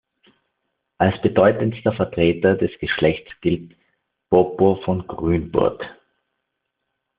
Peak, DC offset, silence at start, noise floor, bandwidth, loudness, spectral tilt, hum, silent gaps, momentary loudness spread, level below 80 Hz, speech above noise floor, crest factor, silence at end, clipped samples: -2 dBFS; under 0.1%; 1 s; -78 dBFS; 5 kHz; -20 LUFS; -5.5 dB/octave; none; none; 8 LU; -48 dBFS; 59 dB; 20 dB; 1.25 s; under 0.1%